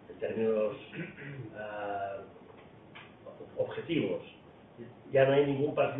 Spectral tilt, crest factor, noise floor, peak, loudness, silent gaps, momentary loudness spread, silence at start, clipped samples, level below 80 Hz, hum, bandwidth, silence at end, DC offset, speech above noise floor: -10 dB/octave; 20 dB; -54 dBFS; -14 dBFS; -32 LUFS; none; 24 LU; 0 s; under 0.1%; -70 dBFS; none; 3.9 kHz; 0 s; under 0.1%; 22 dB